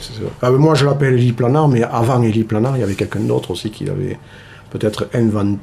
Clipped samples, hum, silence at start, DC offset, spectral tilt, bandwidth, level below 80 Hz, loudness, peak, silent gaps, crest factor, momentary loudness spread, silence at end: under 0.1%; none; 0 s; under 0.1%; -7.5 dB/octave; 14 kHz; -46 dBFS; -16 LUFS; -2 dBFS; none; 12 dB; 11 LU; 0 s